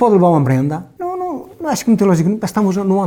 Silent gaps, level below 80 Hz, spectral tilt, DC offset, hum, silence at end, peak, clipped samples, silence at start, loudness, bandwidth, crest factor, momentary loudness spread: none; -52 dBFS; -7.5 dB/octave; under 0.1%; none; 0 s; -2 dBFS; under 0.1%; 0 s; -16 LUFS; 18 kHz; 14 dB; 12 LU